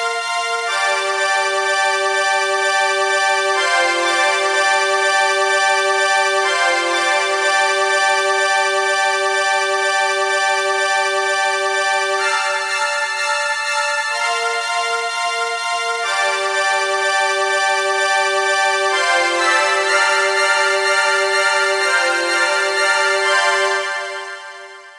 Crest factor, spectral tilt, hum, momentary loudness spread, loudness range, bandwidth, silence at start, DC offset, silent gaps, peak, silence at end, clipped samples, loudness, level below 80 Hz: 16 dB; 1.5 dB/octave; none; 4 LU; 3 LU; 11.5 kHz; 0 s; under 0.1%; none; -2 dBFS; 0 s; under 0.1%; -16 LUFS; -82 dBFS